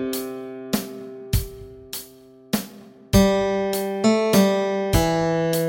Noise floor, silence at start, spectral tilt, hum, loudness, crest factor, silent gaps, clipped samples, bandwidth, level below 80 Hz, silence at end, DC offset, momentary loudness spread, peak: -47 dBFS; 0 s; -5.5 dB/octave; none; -22 LUFS; 20 dB; none; under 0.1%; 17 kHz; -36 dBFS; 0 s; under 0.1%; 16 LU; -2 dBFS